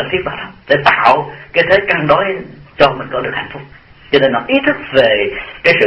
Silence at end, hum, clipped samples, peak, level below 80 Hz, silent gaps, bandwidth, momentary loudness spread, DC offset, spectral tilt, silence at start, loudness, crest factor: 0 s; none; 0.2%; 0 dBFS; -44 dBFS; none; 8.6 kHz; 12 LU; under 0.1%; -6.5 dB/octave; 0 s; -13 LUFS; 14 dB